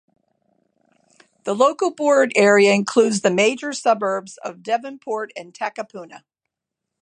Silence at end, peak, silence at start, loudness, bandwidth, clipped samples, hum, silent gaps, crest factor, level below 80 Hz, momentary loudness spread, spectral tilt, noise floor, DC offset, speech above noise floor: 0.85 s; -2 dBFS; 1.45 s; -19 LUFS; 11 kHz; under 0.1%; none; none; 20 dB; -74 dBFS; 18 LU; -4 dB/octave; -83 dBFS; under 0.1%; 64 dB